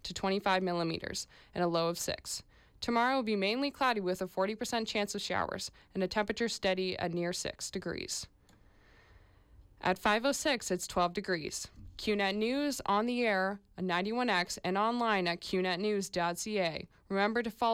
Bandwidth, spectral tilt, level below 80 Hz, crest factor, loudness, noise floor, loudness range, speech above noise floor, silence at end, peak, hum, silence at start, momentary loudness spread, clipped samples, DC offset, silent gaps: 16.5 kHz; -4 dB/octave; -62 dBFS; 14 dB; -33 LUFS; -62 dBFS; 4 LU; 30 dB; 0 s; -18 dBFS; none; 0.05 s; 9 LU; under 0.1%; under 0.1%; none